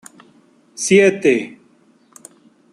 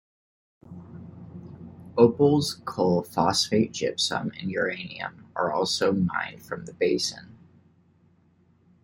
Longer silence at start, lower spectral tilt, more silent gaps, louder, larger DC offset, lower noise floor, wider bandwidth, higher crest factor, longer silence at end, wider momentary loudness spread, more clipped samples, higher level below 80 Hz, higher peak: about the same, 0.8 s vs 0.7 s; about the same, -4.5 dB/octave vs -4.5 dB/octave; neither; first, -15 LUFS vs -25 LUFS; neither; second, -54 dBFS vs -62 dBFS; second, 12.5 kHz vs 16.5 kHz; about the same, 18 dB vs 22 dB; second, 1.25 s vs 1.5 s; second, 13 LU vs 22 LU; neither; about the same, -64 dBFS vs -62 dBFS; about the same, -2 dBFS vs -4 dBFS